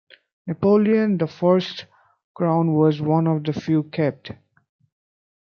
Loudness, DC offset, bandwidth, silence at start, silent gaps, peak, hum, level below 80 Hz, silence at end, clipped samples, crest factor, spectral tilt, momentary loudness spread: -20 LUFS; under 0.1%; 6.6 kHz; 0.45 s; 2.24-2.35 s; -4 dBFS; none; -66 dBFS; 1.1 s; under 0.1%; 18 dB; -9 dB/octave; 16 LU